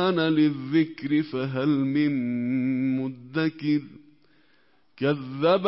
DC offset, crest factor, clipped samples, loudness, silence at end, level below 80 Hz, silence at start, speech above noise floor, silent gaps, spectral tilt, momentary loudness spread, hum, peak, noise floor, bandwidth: under 0.1%; 16 dB; under 0.1%; -25 LUFS; 0 s; -70 dBFS; 0 s; 41 dB; none; -11 dB/octave; 6 LU; none; -10 dBFS; -65 dBFS; 5.8 kHz